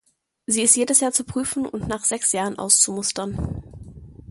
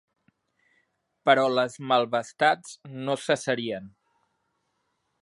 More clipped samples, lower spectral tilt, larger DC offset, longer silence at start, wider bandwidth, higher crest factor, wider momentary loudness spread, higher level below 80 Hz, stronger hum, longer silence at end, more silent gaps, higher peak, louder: neither; second, -2.5 dB/octave vs -4 dB/octave; neither; second, 0.5 s vs 1.25 s; about the same, 12 kHz vs 11.5 kHz; about the same, 22 dB vs 24 dB; about the same, 14 LU vs 13 LU; first, -44 dBFS vs -76 dBFS; neither; second, 0.15 s vs 1.35 s; neither; about the same, -2 dBFS vs -4 dBFS; first, -20 LUFS vs -25 LUFS